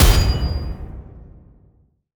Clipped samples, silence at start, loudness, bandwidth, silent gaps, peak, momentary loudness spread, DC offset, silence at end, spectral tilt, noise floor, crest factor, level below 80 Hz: under 0.1%; 0 s; -20 LUFS; over 20 kHz; none; 0 dBFS; 25 LU; under 0.1%; 1 s; -4.5 dB/octave; -57 dBFS; 18 dB; -22 dBFS